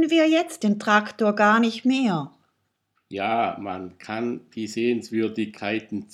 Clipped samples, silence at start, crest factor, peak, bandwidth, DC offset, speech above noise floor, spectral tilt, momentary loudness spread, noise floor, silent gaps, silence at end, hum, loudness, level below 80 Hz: under 0.1%; 0 s; 18 dB; -4 dBFS; 13.5 kHz; under 0.1%; 50 dB; -5 dB/octave; 14 LU; -73 dBFS; none; 0.1 s; none; -23 LUFS; -74 dBFS